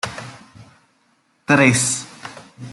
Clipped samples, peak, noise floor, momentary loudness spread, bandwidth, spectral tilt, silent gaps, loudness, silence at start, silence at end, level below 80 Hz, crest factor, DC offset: under 0.1%; -2 dBFS; -62 dBFS; 24 LU; 12.5 kHz; -4 dB/octave; none; -16 LUFS; 0.05 s; 0 s; -58 dBFS; 20 dB; under 0.1%